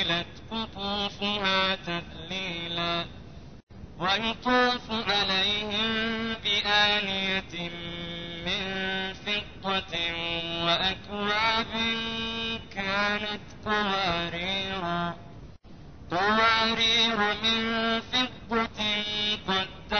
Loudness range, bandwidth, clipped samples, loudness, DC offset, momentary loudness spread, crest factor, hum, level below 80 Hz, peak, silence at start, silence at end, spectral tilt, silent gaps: 5 LU; 6.6 kHz; under 0.1%; -27 LUFS; 0.3%; 12 LU; 18 dB; none; -50 dBFS; -10 dBFS; 0 s; 0 s; -3.5 dB/octave; 3.63-3.67 s